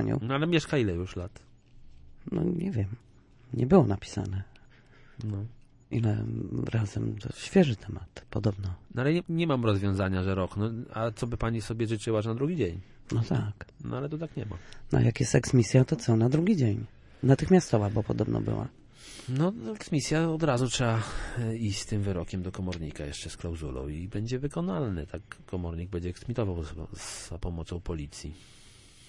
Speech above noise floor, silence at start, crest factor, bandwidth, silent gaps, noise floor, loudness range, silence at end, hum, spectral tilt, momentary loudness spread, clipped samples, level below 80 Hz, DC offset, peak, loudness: 26 dB; 0 s; 22 dB; 11.5 kHz; none; -55 dBFS; 9 LU; 0.4 s; none; -6.5 dB/octave; 14 LU; under 0.1%; -48 dBFS; under 0.1%; -8 dBFS; -30 LUFS